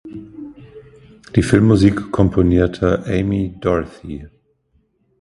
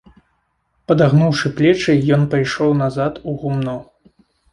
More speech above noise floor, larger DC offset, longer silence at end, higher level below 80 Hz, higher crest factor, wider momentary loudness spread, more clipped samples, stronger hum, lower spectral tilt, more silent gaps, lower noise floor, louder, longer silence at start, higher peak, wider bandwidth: second, 46 dB vs 50 dB; neither; first, 0.95 s vs 0.7 s; first, -34 dBFS vs -48 dBFS; about the same, 18 dB vs 16 dB; first, 21 LU vs 9 LU; neither; neither; about the same, -8 dB/octave vs -7 dB/octave; neither; second, -62 dBFS vs -66 dBFS; about the same, -16 LUFS vs -16 LUFS; second, 0.05 s vs 0.9 s; about the same, 0 dBFS vs -2 dBFS; about the same, 11.5 kHz vs 11 kHz